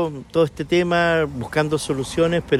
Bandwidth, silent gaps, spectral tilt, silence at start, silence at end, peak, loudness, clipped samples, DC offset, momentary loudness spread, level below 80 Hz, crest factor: 13 kHz; none; -5.5 dB/octave; 0 s; 0 s; -6 dBFS; -21 LUFS; under 0.1%; under 0.1%; 5 LU; -44 dBFS; 14 dB